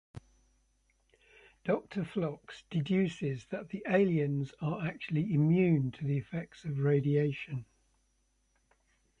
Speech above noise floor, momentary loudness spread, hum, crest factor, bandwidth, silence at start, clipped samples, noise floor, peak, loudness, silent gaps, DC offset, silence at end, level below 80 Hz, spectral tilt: 43 dB; 12 LU; none; 18 dB; 8 kHz; 0.15 s; under 0.1%; -74 dBFS; -16 dBFS; -32 LUFS; none; under 0.1%; 1.55 s; -66 dBFS; -8.5 dB/octave